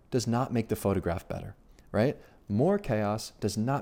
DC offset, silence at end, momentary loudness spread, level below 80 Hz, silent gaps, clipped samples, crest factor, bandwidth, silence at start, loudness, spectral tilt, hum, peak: under 0.1%; 0 s; 12 LU; -52 dBFS; none; under 0.1%; 14 dB; 17 kHz; 0.1 s; -30 LUFS; -6.5 dB/octave; none; -14 dBFS